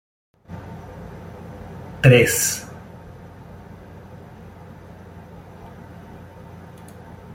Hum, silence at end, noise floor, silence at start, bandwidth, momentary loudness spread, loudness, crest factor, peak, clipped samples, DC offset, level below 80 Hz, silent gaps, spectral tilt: none; 0 s; -41 dBFS; 0.5 s; 16.5 kHz; 26 LU; -16 LUFS; 24 dB; -2 dBFS; under 0.1%; under 0.1%; -50 dBFS; none; -4.5 dB/octave